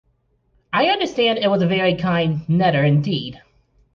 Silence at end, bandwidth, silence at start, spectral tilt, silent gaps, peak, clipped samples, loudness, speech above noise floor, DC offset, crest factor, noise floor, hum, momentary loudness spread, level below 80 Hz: 0.6 s; 7.2 kHz; 0.7 s; -7 dB/octave; none; -6 dBFS; under 0.1%; -18 LUFS; 46 dB; under 0.1%; 14 dB; -64 dBFS; none; 7 LU; -54 dBFS